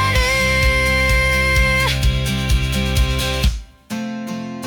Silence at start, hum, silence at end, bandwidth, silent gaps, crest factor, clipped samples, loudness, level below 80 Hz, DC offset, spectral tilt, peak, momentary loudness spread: 0 s; none; 0 s; 20 kHz; none; 12 dB; under 0.1%; -17 LUFS; -22 dBFS; under 0.1%; -4 dB/octave; -6 dBFS; 12 LU